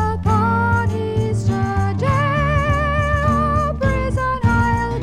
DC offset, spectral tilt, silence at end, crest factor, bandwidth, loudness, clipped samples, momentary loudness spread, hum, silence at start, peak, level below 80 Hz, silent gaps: under 0.1%; -7.5 dB/octave; 0 s; 12 dB; 10 kHz; -18 LUFS; under 0.1%; 3 LU; none; 0 s; -4 dBFS; -28 dBFS; none